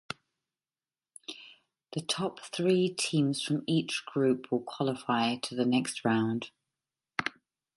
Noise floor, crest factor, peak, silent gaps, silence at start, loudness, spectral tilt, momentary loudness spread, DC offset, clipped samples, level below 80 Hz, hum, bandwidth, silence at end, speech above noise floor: under -90 dBFS; 20 dB; -12 dBFS; none; 1.3 s; -31 LUFS; -5 dB/octave; 16 LU; under 0.1%; under 0.1%; -76 dBFS; none; 11.5 kHz; 0.45 s; over 60 dB